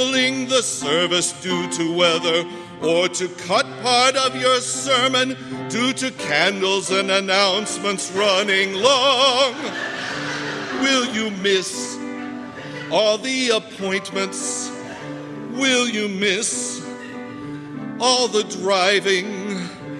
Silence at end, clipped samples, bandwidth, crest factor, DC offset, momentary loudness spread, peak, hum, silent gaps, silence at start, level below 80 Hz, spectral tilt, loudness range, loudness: 0 s; under 0.1%; 13.5 kHz; 20 dB; under 0.1%; 14 LU; 0 dBFS; none; none; 0 s; -64 dBFS; -2.5 dB/octave; 5 LU; -19 LUFS